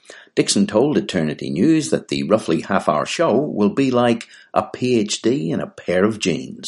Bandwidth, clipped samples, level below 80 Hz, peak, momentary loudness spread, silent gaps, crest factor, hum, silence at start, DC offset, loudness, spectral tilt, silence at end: 11.5 kHz; under 0.1%; -56 dBFS; -2 dBFS; 6 LU; none; 18 dB; none; 0.1 s; under 0.1%; -19 LUFS; -5 dB/octave; 0 s